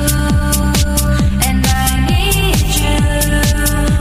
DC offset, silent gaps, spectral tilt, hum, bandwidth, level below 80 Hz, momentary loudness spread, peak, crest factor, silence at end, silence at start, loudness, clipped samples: under 0.1%; none; -4.5 dB/octave; none; 15.5 kHz; -16 dBFS; 1 LU; 0 dBFS; 12 dB; 0 s; 0 s; -13 LUFS; under 0.1%